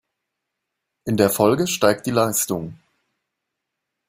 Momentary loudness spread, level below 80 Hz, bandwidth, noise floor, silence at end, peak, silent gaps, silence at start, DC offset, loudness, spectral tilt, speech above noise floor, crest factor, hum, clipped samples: 12 LU; -56 dBFS; 16 kHz; -81 dBFS; 1.35 s; -2 dBFS; none; 1.05 s; under 0.1%; -20 LUFS; -4.5 dB/octave; 61 dB; 22 dB; none; under 0.1%